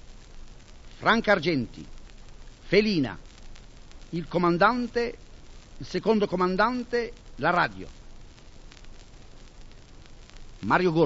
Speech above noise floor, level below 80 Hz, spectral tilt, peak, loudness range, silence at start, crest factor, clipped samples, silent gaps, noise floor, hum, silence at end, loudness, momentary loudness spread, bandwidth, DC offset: 22 dB; -46 dBFS; -6 dB/octave; -6 dBFS; 6 LU; 0.05 s; 22 dB; under 0.1%; none; -46 dBFS; none; 0 s; -25 LUFS; 21 LU; 8 kHz; under 0.1%